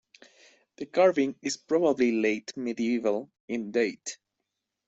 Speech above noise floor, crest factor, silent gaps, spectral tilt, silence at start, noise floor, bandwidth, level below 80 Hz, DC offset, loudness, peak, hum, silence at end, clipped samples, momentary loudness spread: 57 dB; 18 dB; 3.40-3.48 s; -4.5 dB/octave; 0.8 s; -84 dBFS; 8.2 kHz; -74 dBFS; under 0.1%; -27 LUFS; -10 dBFS; none; 0.7 s; under 0.1%; 14 LU